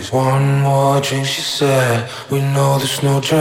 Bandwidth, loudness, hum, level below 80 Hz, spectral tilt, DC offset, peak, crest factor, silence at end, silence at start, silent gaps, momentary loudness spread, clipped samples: 16.5 kHz; -16 LUFS; none; -54 dBFS; -5 dB/octave; under 0.1%; -2 dBFS; 14 dB; 0 s; 0 s; none; 4 LU; under 0.1%